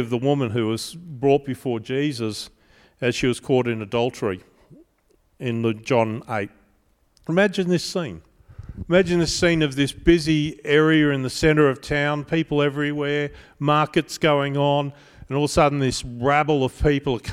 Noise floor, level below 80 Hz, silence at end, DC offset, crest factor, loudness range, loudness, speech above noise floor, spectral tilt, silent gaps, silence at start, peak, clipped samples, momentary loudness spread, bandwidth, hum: -63 dBFS; -42 dBFS; 0 s; under 0.1%; 20 dB; 6 LU; -22 LUFS; 42 dB; -5.5 dB/octave; none; 0 s; -2 dBFS; under 0.1%; 10 LU; 15 kHz; none